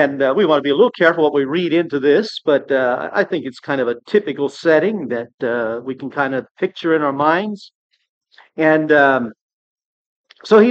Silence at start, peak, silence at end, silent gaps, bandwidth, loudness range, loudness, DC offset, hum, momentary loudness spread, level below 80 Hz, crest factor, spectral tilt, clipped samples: 0 s; 0 dBFS; 0 s; 5.34-5.38 s, 6.51-6.55 s, 7.75-7.90 s, 8.09-8.21 s, 9.41-9.76 s, 9.85-10.24 s; 8.2 kHz; 4 LU; -17 LUFS; under 0.1%; none; 11 LU; -72 dBFS; 16 dB; -6.5 dB/octave; under 0.1%